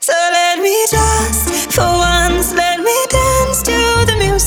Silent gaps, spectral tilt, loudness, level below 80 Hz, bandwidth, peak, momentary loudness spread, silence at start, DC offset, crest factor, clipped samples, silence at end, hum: none; -3 dB/octave; -12 LUFS; -22 dBFS; 20 kHz; 0 dBFS; 2 LU; 0 s; under 0.1%; 12 dB; under 0.1%; 0 s; none